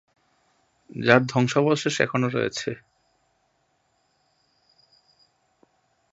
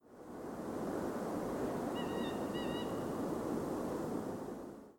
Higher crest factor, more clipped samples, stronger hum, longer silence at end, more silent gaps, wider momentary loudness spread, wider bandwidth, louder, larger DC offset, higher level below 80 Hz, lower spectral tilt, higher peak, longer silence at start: first, 26 dB vs 14 dB; neither; neither; first, 3.35 s vs 0 s; neither; first, 15 LU vs 7 LU; second, 8 kHz vs 19 kHz; first, -22 LUFS vs -40 LUFS; neither; about the same, -66 dBFS vs -62 dBFS; about the same, -5 dB/octave vs -6 dB/octave; first, 0 dBFS vs -26 dBFS; first, 0.95 s vs 0.05 s